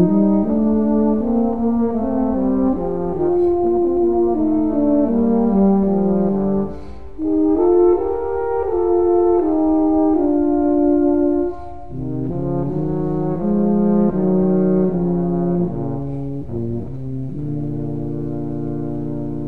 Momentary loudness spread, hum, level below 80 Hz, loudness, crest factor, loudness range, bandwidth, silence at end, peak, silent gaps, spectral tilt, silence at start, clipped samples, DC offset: 10 LU; none; -38 dBFS; -18 LUFS; 14 dB; 6 LU; 2.6 kHz; 0 s; -4 dBFS; none; -12.5 dB/octave; 0 s; under 0.1%; 3%